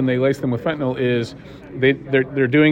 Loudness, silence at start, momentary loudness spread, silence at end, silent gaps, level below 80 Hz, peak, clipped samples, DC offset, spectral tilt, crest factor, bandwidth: -19 LUFS; 0 s; 11 LU; 0 s; none; -52 dBFS; -4 dBFS; under 0.1%; under 0.1%; -7.5 dB/octave; 14 dB; 10 kHz